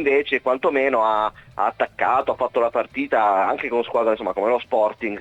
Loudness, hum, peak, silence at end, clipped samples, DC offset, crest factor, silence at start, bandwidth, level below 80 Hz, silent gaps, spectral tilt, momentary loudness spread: -21 LUFS; none; -6 dBFS; 0 s; under 0.1%; under 0.1%; 14 dB; 0 s; 9 kHz; -58 dBFS; none; -6 dB/octave; 4 LU